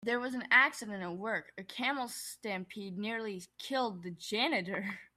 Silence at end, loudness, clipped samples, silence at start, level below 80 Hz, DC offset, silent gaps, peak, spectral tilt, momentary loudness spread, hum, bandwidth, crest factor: 0.1 s; -34 LUFS; under 0.1%; 0 s; -78 dBFS; under 0.1%; none; -12 dBFS; -3.5 dB/octave; 15 LU; none; 16 kHz; 24 dB